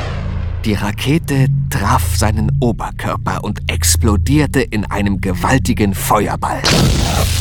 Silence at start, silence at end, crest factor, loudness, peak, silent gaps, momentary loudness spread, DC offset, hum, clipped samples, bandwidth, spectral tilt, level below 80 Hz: 0 s; 0 s; 14 dB; -15 LUFS; 0 dBFS; none; 7 LU; under 0.1%; none; under 0.1%; 19 kHz; -5 dB/octave; -24 dBFS